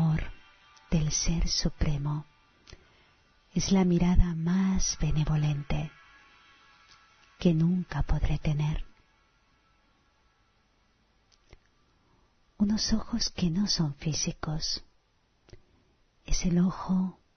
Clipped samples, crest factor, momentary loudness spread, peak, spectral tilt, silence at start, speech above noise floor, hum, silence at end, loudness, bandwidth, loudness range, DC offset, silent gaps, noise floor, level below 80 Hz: under 0.1%; 22 dB; 8 LU; -8 dBFS; -5 dB/octave; 0 s; 42 dB; none; 0.25 s; -29 LUFS; 6.6 kHz; 7 LU; under 0.1%; none; -69 dBFS; -36 dBFS